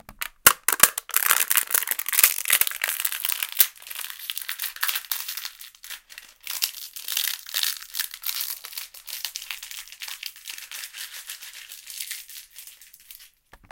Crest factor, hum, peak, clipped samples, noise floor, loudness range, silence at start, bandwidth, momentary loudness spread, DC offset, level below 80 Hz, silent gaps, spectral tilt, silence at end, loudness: 28 dB; none; 0 dBFS; under 0.1%; -52 dBFS; 16 LU; 0.1 s; 17.5 kHz; 21 LU; under 0.1%; -62 dBFS; none; 2 dB/octave; 0.15 s; -23 LUFS